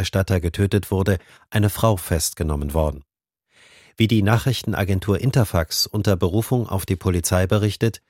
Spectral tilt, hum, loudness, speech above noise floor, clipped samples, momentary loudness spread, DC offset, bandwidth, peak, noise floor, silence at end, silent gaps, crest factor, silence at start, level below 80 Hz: -5.5 dB/octave; none; -21 LUFS; 45 dB; under 0.1%; 4 LU; under 0.1%; 17 kHz; -2 dBFS; -65 dBFS; 0.15 s; none; 18 dB; 0 s; -36 dBFS